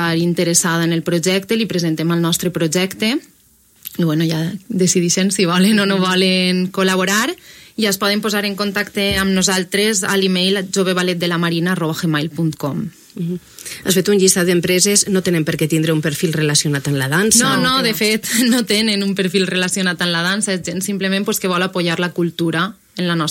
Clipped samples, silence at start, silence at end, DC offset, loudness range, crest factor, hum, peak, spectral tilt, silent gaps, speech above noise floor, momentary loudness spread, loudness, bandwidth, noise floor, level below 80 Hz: under 0.1%; 0 s; 0 s; under 0.1%; 4 LU; 16 dB; none; 0 dBFS; -3.5 dB/octave; none; 35 dB; 8 LU; -16 LUFS; 16.5 kHz; -52 dBFS; -50 dBFS